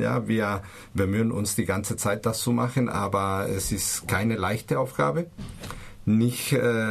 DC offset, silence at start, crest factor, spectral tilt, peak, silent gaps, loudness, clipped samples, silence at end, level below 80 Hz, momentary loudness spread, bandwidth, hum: under 0.1%; 0 s; 16 dB; -5 dB/octave; -10 dBFS; none; -26 LUFS; under 0.1%; 0 s; -48 dBFS; 10 LU; 14 kHz; none